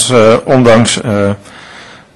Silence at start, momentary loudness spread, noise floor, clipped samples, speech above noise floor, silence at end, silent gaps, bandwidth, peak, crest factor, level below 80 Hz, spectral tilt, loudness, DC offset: 0 s; 9 LU; -34 dBFS; 0.5%; 26 dB; 0.2 s; none; 12 kHz; 0 dBFS; 10 dB; -40 dBFS; -4.5 dB/octave; -8 LUFS; under 0.1%